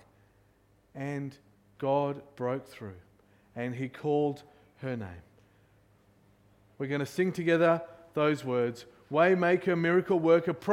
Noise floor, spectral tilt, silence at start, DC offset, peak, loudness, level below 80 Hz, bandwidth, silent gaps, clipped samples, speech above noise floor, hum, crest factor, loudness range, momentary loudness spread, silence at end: -65 dBFS; -7 dB/octave; 0.95 s; under 0.1%; -12 dBFS; -29 LUFS; -70 dBFS; 15 kHz; none; under 0.1%; 37 dB; none; 18 dB; 9 LU; 19 LU; 0 s